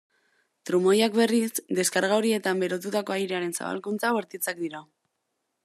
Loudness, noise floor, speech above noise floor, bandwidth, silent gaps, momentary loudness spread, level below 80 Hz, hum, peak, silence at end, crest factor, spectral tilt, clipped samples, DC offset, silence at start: -26 LUFS; -79 dBFS; 53 dB; 14 kHz; none; 10 LU; -82 dBFS; none; -8 dBFS; 0.8 s; 18 dB; -4 dB/octave; under 0.1%; under 0.1%; 0.65 s